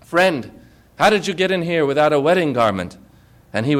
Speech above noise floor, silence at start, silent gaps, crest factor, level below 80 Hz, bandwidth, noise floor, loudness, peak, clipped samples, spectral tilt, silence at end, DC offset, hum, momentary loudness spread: 32 dB; 0.1 s; none; 14 dB; -52 dBFS; 16 kHz; -49 dBFS; -18 LUFS; -4 dBFS; under 0.1%; -5.5 dB/octave; 0 s; under 0.1%; none; 12 LU